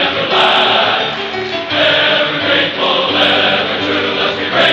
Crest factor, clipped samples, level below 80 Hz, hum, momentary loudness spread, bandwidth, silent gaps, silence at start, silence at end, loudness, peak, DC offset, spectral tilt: 14 dB; under 0.1%; -50 dBFS; none; 6 LU; 9.6 kHz; none; 0 s; 0 s; -12 LUFS; 0 dBFS; under 0.1%; -4 dB/octave